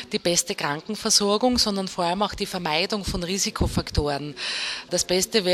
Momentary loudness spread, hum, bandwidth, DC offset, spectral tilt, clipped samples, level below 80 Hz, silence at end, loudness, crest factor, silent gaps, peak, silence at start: 8 LU; none; 16 kHz; under 0.1%; -3 dB/octave; under 0.1%; -38 dBFS; 0 s; -23 LUFS; 20 dB; none; -6 dBFS; 0 s